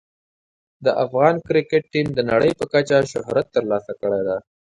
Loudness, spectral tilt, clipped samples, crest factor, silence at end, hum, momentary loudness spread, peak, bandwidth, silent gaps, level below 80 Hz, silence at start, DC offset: -20 LUFS; -6 dB/octave; under 0.1%; 20 dB; 0.3 s; none; 6 LU; -2 dBFS; 11 kHz; none; -54 dBFS; 0.8 s; under 0.1%